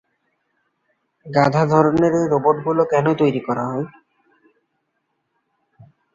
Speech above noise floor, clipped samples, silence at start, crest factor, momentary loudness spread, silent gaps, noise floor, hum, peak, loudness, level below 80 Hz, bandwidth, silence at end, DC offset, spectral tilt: 55 dB; under 0.1%; 1.25 s; 18 dB; 8 LU; none; -72 dBFS; none; -2 dBFS; -18 LUFS; -56 dBFS; 7.6 kHz; 2.25 s; under 0.1%; -7.5 dB/octave